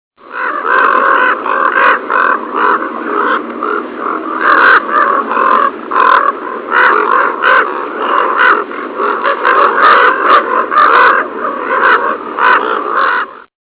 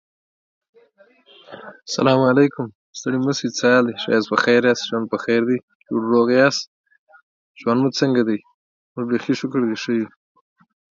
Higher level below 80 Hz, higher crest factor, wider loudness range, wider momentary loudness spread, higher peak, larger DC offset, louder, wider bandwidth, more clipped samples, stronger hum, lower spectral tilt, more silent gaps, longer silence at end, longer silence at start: first, -58 dBFS vs -68 dBFS; second, 10 dB vs 20 dB; about the same, 3 LU vs 4 LU; second, 10 LU vs 14 LU; about the same, 0 dBFS vs 0 dBFS; neither; first, -10 LUFS vs -19 LUFS; second, 4 kHz vs 7.6 kHz; first, 0.3% vs under 0.1%; neither; about the same, -5.5 dB/octave vs -5 dB/octave; second, none vs 2.75-2.93 s, 5.63-5.68 s, 5.75-5.80 s, 6.67-6.84 s, 6.98-7.07 s, 7.22-7.55 s, 8.54-8.95 s; second, 0.25 s vs 0.9 s; second, 0.25 s vs 1.5 s